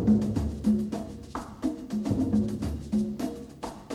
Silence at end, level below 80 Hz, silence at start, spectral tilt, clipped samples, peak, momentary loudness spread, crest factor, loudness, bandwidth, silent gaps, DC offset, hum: 0 s; -42 dBFS; 0 s; -8 dB/octave; under 0.1%; -12 dBFS; 13 LU; 16 dB; -30 LUFS; 13 kHz; none; under 0.1%; none